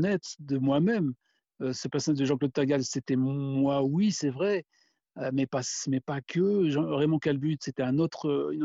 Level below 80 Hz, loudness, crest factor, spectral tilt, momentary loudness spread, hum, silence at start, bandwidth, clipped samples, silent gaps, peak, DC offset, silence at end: -68 dBFS; -28 LUFS; 14 dB; -6 dB/octave; 7 LU; none; 0 s; 8 kHz; under 0.1%; none; -14 dBFS; under 0.1%; 0 s